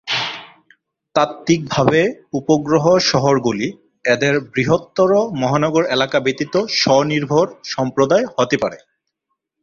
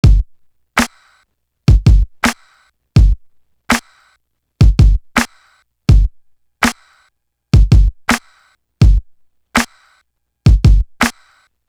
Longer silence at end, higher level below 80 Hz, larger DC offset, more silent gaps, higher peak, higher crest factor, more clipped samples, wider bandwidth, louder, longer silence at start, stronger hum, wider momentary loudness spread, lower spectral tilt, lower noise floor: first, 0.85 s vs 0.55 s; second, -54 dBFS vs -16 dBFS; neither; neither; about the same, 0 dBFS vs 0 dBFS; about the same, 16 dB vs 14 dB; neither; second, 7.4 kHz vs 14 kHz; about the same, -17 LUFS vs -15 LUFS; about the same, 0.05 s vs 0.05 s; neither; about the same, 8 LU vs 9 LU; about the same, -5 dB/octave vs -5.5 dB/octave; first, -75 dBFS vs -63 dBFS